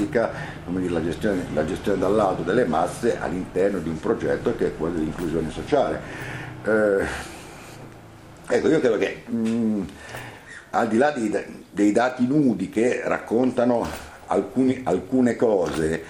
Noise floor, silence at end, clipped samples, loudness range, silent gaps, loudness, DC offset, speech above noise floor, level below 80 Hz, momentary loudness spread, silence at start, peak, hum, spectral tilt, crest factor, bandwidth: -44 dBFS; 0 s; under 0.1%; 3 LU; none; -23 LUFS; under 0.1%; 21 dB; -46 dBFS; 13 LU; 0 s; -6 dBFS; none; -6.5 dB/octave; 18 dB; 16 kHz